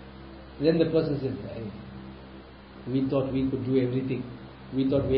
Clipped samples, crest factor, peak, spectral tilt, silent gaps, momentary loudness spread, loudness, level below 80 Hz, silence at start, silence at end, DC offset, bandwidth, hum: under 0.1%; 18 dB; -10 dBFS; -12 dB/octave; none; 21 LU; -28 LUFS; -50 dBFS; 0 s; 0 s; under 0.1%; 5.4 kHz; none